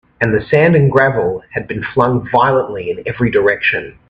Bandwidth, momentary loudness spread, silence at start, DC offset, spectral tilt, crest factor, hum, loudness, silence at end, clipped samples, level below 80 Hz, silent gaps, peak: 5.6 kHz; 11 LU; 0.2 s; under 0.1%; -9 dB/octave; 14 dB; none; -14 LUFS; 0.2 s; under 0.1%; -44 dBFS; none; 0 dBFS